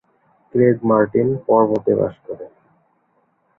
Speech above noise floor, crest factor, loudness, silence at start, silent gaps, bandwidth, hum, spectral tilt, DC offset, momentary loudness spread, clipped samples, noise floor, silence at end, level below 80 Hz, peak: 47 dB; 18 dB; -17 LUFS; 0.55 s; none; 3.7 kHz; none; -11.5 dB/octave; under 0.1%; 17 LU; under 0.1%; -63 dBFS; 1.1 s; -56 dBFS; -2 dBFS